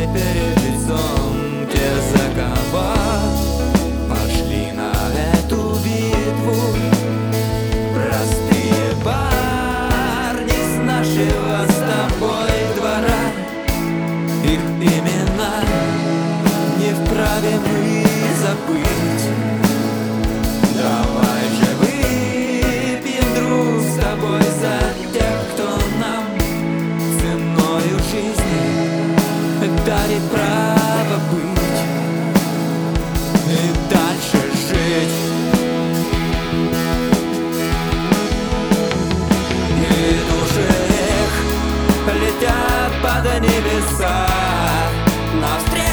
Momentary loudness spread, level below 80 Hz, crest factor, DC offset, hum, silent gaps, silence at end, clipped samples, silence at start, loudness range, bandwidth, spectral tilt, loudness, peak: 4 LU; -26 dBFS; 16 dB; under 0.1%; none; none; 0 s; under 0.1%; 0 s; 2 LU; over 20 kHz; -5.5 dB/octave; -17 LUFS; 0 dBFS